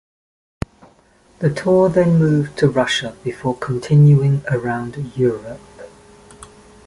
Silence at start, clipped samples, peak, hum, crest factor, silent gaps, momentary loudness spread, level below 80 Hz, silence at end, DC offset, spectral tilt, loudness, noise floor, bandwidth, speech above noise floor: 1.4 s; under 0.1%; -2 dBFS; none; 16 dB; none; 19 LU; -48 dBFS; 1 s; under 0.1%; -7 dB/octave; -17 LUFS; -52 dBFS; 11.5 kHz; 36 dB